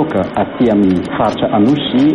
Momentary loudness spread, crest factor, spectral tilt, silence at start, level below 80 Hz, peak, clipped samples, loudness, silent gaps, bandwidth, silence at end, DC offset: 4 LU; 10 dB; -7.5 dB/octave; 0 s; -42 dBFS; -2 dBFS; under 0.1%; -13 LUFS; none; 10 kHz; 0 s; under 0.1%